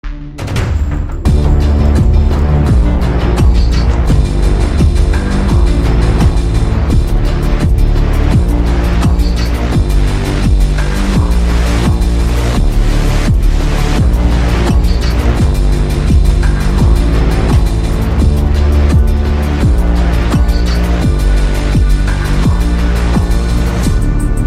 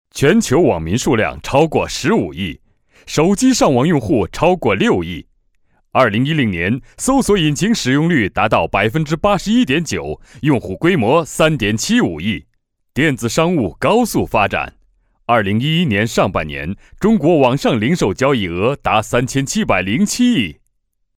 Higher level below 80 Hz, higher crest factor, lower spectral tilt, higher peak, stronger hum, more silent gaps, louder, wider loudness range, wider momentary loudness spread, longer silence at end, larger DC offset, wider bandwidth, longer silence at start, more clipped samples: first, -10 dBFS vs -38 dBFS; second, 10 dB vs 16 dB; first, -7 dB/octave vs -5 dB/octave; about the same, 0 dBFS vs 0 dBFS; neither; neither; about the same, -13 LUFS vs -15 LUFS; about the same, 1 LU vs 2 LU; second, 3 LU vs 9 LU; second, 0 s vs 0.65 s; neither; second, 13.5 kHz vs 16.5 kHz; about the same, 0.05 s vs 0.15 s; neither